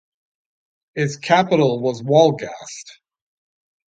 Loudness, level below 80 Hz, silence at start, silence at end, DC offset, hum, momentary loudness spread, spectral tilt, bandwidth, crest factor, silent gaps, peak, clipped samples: -18 LUFS; -66 dBFS; 0.95 s; 0.95 s; under 0.1%; none; 18 LU; -5.5 dB/octave; 9.2 kHz; 20 dB; none; -2 dBFS; under 0.1%